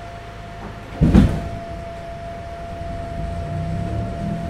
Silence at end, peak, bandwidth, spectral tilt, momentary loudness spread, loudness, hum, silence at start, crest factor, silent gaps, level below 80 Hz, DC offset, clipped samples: 0 s; 0 dBFS; 12 kHz; -8 dB/octave; 18 LU; -23 LUFS; none; 0 s; 22 dB; none; -28 dBFS; under 0.1%; under 0.1%